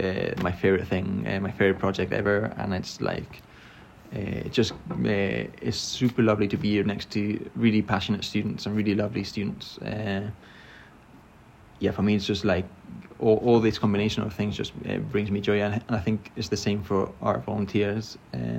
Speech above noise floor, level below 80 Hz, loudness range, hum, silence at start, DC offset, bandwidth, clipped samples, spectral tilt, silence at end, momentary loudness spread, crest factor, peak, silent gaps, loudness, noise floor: 26 dB; -54 dBFS; 5 LU; none; 0 s; under 0.1%; 14 kHz; under 0.1%; -6 dB/octave; 0 s; 10 LU; 18 dB; -8 dBFS; none; -26 LUFS; -52 dBFS